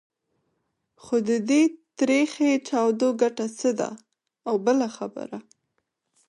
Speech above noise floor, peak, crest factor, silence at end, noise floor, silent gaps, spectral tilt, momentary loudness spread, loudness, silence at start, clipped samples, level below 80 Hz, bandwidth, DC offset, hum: 54 dB; -8 dBFS; 16 dB; 0.85 s; -77 dBFS; none; -4.5 dB/octave; 13 LU; -24 LUFS; 1.05 s; under 0.1%; -76 dBFS; 11 kHz; under 0.1%; none